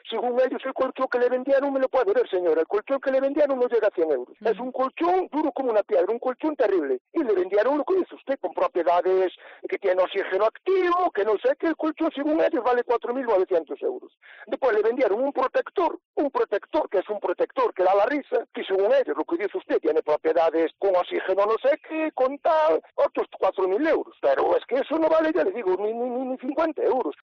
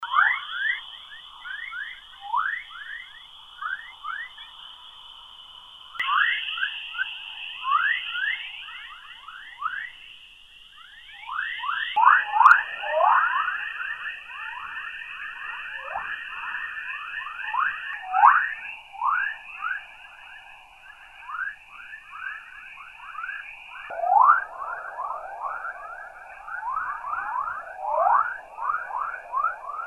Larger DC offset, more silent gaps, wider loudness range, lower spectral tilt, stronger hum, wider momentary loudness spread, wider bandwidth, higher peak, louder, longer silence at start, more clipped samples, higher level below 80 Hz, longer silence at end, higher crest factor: neither; first, 7.01-7.05 s, 16.05-16.14 s vs none; second, 2 LU vs 14 LU; first, -2 dB/octave vs -0.5 dB/octave; neither; second, 6 LU vs 23 LU; second, 6.4 kHz vs 12.5 kHz; second, -12 dBFS vs -4 dBFS; about the same, -24 LUFS vs -25 LUFS; about the same, 0.05 s vs 0 s; neither; about the same, -66 dBFS vs -64 dBFS; about the same, 0.1 s vs 0 s; second, 10 dB vs 24 dB